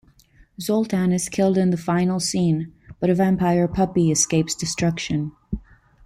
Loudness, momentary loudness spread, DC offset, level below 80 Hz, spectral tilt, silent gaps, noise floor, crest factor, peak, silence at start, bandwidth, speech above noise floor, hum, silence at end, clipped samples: -21 LUFS; 11 LU; under 0.1%; -46 dBFS; -5 dB/octave; none; -54 dBFS; 16 dB; -6 dBFS; 0.6 s; 15 kHz; 34 dB; none; 0.45 s; under 0.1%